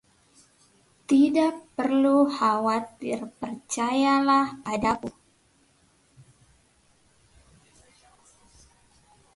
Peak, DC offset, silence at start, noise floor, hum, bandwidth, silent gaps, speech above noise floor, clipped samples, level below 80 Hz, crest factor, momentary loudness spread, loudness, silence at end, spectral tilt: -10 dBFS; under 0.1%; 1.1 s; -64 dBFS; none; 11.5 kHz; none; 40 dB; under 0.1%; -62 dBFS; 16 dB; 12 LU; -24 LUFS; 4.25 s; -4.5 dB/octave